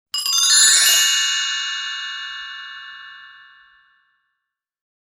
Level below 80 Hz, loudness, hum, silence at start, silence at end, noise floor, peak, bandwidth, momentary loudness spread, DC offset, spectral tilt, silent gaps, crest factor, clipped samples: -72 dBFS; -14 LUFS; none; 0.15 s; 1.8 s; -80 dBFS; -2 dBFS; 17 kHz; 24 LU; under 0.1%; 5.5 dB/octave; none; 20 dB; under 0.1%